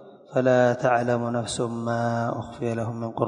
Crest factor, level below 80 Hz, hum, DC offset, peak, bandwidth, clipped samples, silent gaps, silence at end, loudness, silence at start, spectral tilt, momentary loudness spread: 18 dB; -58 dBFS; none; under 0.1%; -6 dBFS; 10.5 kHz; under 0.1%; none; 0 s; -25 LUFS; 0 s; -6 dB/octave; 10 LU